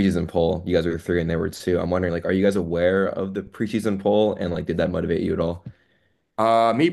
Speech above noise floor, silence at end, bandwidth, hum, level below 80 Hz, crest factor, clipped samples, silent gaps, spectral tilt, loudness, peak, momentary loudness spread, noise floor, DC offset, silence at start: 45 dB; 0 s; 12.5 kHz; none; -50 dBFS; 16 dB; under 0.1%; none; -7 dB/octave; -22 LUFS; -6 dBFS; 7 LU; -66 dBFS; under 0.1%; 0 s